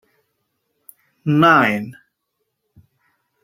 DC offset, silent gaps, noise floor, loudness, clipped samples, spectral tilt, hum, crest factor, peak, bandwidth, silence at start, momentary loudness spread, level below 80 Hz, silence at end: under 0.1%; none; -75 dBFS; -15 LUFS; under 0.1%; -7 dB/octave; none; 20 dB; -2 dBFS; 16.5 kHz; 1.25 s; 17 LU; -64 dBFS; 1.5 s